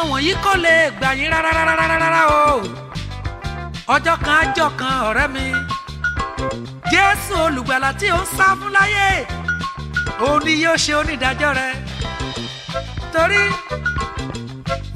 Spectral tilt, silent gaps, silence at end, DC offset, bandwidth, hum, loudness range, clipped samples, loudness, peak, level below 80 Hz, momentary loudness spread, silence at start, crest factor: -4 dB/octave; none; 0 s; under 0.1%; 16 kHz; none; 3 LU; under 0.1%; -17 LUFS; 0 dBFS; -34 dBFS; 13 LU; 0 s; 18 dB